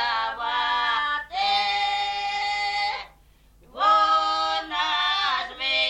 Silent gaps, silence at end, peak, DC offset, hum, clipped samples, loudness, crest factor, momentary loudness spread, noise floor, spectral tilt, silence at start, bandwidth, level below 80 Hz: none; 0 s; -10 dBFS; under 0.1%; none; under 0.1%; -23 LUFS; 16 dB; 6 LU; -55 dBFS; -0.5 dB/octave; 0 s; 11 kHz; -56 dBFS